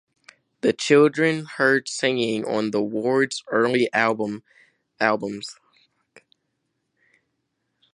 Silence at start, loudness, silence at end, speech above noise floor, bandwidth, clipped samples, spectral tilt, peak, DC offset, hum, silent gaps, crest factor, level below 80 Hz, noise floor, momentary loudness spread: 0.65 s; -22 LUFS; 2.4 s; 54 dB; 11.5 kHz; under 0.1%; -4.5 dB/octave; -2 dBFS; under 0.1%; none; none; 22 dB; -72 dBFS; -75 dBFS; 11 LU